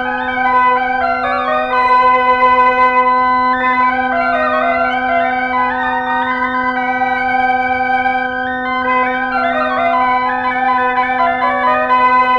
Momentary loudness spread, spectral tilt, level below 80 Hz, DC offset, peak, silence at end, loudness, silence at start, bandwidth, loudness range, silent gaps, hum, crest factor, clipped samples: 5 LU; -5.5 dB/octave; -44 dBFS; under 0.1%; -2 dBFS; 0 s; -13 LUFS; 0 s; 6.4 kHz; 3 LU; none; none; 12 dB; under 0.1%